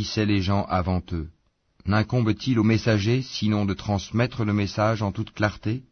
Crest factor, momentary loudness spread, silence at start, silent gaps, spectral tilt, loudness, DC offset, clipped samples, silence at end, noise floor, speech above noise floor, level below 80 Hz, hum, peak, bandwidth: 16 dB; 7 LU; 0 s; none; -6.5 dB/octave; -24 LUFS; under 0.1%; under 0.1%; 0.1 s; -61 dBFS; 37 dB; -46 dBFS; none; -8 dBFS; 6.6 kHz